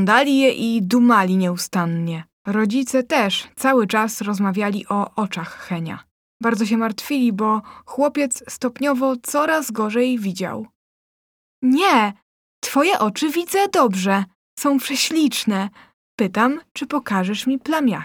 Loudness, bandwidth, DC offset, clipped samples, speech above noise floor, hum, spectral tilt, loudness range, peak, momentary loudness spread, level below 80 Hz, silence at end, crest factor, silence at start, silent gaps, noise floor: -20 LUFS; over 20 kHz; under 0.1%; under 0.1%; over 71 dB; none; -4.5 dB/octave; 3 LU; -2 dBFS; 11 LU; -66 dBFS; 0 s; 18 dB; 0 s; 2.33-2.45 s, 6.11-6.40 s, 10.75-11.62 s, 12.22-12.62 s, 14.35-14.57 s, 15.93-16.18 s, 16.71-16.75 s; under -90 dBFS